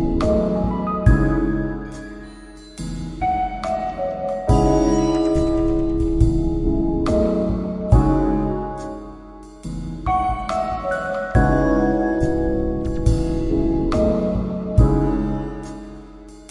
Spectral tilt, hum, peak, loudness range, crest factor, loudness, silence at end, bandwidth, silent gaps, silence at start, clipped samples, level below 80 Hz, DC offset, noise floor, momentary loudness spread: -8 dB/octave; none; -2 dBFS; 4 LU; 18 dB; -20 LUFS; 0 s; 11 kHz; none; 0 s; under 0.1%; -26 dBFS; under 0.1%; -40 dBFS; 16 LU